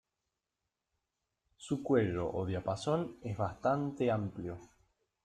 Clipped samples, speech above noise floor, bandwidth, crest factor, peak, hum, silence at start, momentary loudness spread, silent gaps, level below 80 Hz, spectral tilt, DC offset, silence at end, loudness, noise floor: under 0.1%; 54 dB; 11 kHz; 20 dB; -16 dBFS; none; 1.6 s; 12 LU; none; -64 dBFS; -7 dB/octave; under 0.1%; 0.6 s; -35 LUFS; -88 dBFS